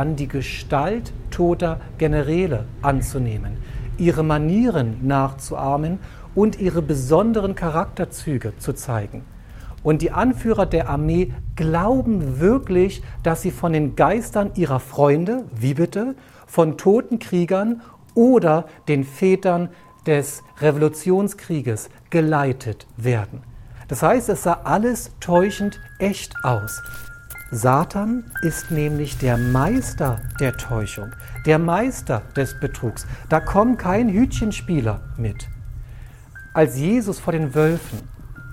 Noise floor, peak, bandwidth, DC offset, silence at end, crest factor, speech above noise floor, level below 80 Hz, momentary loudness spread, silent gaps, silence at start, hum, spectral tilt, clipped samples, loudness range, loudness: -40 dBFS; -2 dBFS; 17 kHz; under 0.1%; 0 s; 18 dB; 20 dB; -36 dBFS; 12 LU; none; 0 s; none; -7 dB/octave; under 0.1%; 3 LU; -21 LUFS